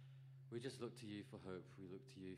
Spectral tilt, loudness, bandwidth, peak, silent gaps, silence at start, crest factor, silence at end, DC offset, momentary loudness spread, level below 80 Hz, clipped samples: -6 dB/octave; -54 LUFS; 15 kHz; -36 dBFS; none; 0 s; 18 dB; 0 s; under 0.1%; 7 LU; -86 dBFS; under 0.1%